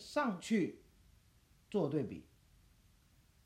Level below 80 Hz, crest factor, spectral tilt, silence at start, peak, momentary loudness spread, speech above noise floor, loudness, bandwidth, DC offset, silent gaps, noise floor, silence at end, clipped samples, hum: -70 dBFS; 18 dB; -6 dB/octave; 0 s; -22 dBFS; 13 LU; 32 dB; -38 LUFS; 15 kHz; under 0.1%; none; -68 dBFS; 1.25 s; under 0.1%; none